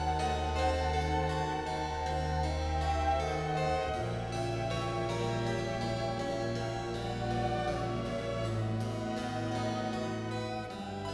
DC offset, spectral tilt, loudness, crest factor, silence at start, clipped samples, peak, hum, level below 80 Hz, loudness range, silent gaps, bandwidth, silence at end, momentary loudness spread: under 0.1%; -6 dB/octave; -34 LUFS; 14 dB; 0 s; under 0.1%; -18 dBFS; none; -42 dBFS; 2 LU; none; 11 kHz; 0 s; 5 LU